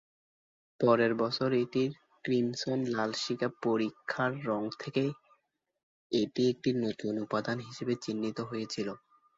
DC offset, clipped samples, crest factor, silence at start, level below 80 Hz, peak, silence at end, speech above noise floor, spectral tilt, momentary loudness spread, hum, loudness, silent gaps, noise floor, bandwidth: under 0.1%; under 0.1%; 20 dB; 0.8 s; -72 dBFS; -12 dBFS; 0.4 s; 44 dB; -5.5 dB/octave; 8 LU; none; -32 LUFS; 5.83-6.10 s; -75 dBFS; 7.8 kHz